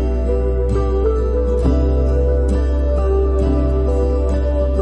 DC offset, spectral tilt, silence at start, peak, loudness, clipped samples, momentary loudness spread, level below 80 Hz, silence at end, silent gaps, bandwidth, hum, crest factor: under 0.1%; -9.5 dB/octave; 0 s; -4 dBFS; -18 LUFS; under 0.1%; 2 LU; -16 dBFS; 0 s; none; 5.4 kHz; none; 12 dB